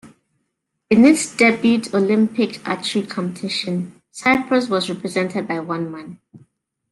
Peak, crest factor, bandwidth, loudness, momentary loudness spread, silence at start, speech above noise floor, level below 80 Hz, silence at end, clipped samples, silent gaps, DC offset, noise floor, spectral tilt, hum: -2 dBFS; 18 dB; 12 kHz; -19 LUFS; 12 LU; 0.05 s; 56 dB; -60 dBFS; 0.55 s; under 0.1%; none; under 0.1%; -74 dBFS; -4.5 dB/octave; none